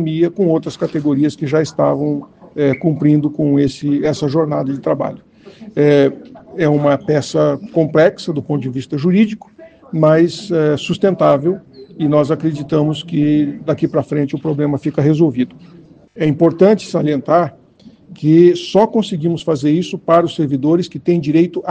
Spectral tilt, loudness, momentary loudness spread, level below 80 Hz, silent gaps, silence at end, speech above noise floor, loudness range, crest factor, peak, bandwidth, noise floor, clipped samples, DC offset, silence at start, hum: -7.5 dB/octave; -15 LUFS; 8 LU; -54 dBFS; none; 0 s; 29 dB; 2 LU; 14 dB; 0 dBFS; 9 kHz; -44 dBFS; under 0.1%; under 0.1%; 0 s; none